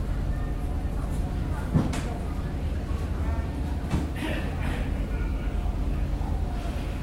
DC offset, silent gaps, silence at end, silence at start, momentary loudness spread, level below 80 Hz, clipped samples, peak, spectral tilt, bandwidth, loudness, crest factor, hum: under 0.1%; none; 0 s; 0 s; 4 LU; -30 dBFS; under 0.1%; -10 dBFS; -7 dB/octave; 13.5 kHz; -30 LUFS; 16 dB; none